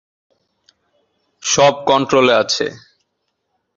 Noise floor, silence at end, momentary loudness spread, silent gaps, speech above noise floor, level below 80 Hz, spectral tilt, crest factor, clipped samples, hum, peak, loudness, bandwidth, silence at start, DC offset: -72 dBFS; 1 s; 10 LU; none; 58 dB; -58 dBFS; -3 dB/octave; 18 dB; under 0.1%; none; 0 dBFS; -15 LUFS; 7.8 kHz; 1.45 s; under 0.1%